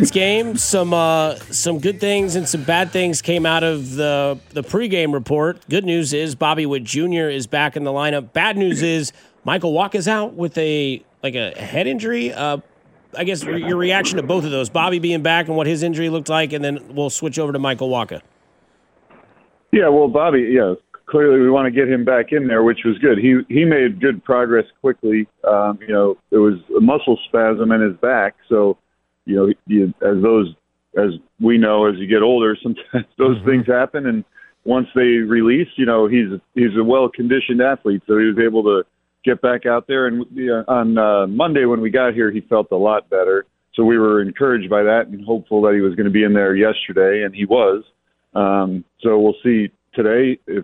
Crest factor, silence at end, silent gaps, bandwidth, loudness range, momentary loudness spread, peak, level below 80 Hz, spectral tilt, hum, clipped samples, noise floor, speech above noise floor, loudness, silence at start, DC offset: 14 dB; 0 s; none; 16 kHz; 5 LU; 8 LU; -2 dBFS; -56 dBFS; -5 dB/octave; none; under 0.1%; -58 dBFS; 42 dB; -17 LUFS; 0 s; under 0.1%